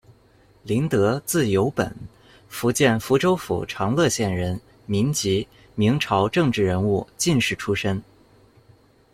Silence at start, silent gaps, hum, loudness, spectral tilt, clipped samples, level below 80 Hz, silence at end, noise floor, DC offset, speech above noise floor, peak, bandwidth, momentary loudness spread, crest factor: 0.65 s; none; none; -22 LUFS; -5 dB/octave; under 0.1%; -52 dBFS; 1.1 s; -55 dBFS; under 0.1%; 34 dB; -2 dBFS; 16.5 kHz; 9 LU; 20 dB